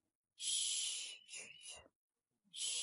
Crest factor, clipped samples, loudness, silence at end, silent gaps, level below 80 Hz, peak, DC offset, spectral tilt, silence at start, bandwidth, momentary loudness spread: 20 dB; under 0.1%; -40 LUFS; 0 s; 1.95-2.08 s; -86 dBFS; -26 dBFS; under 0.1%; 4 dB/octave; 0.4 s; 11.5 kHz; 18 LU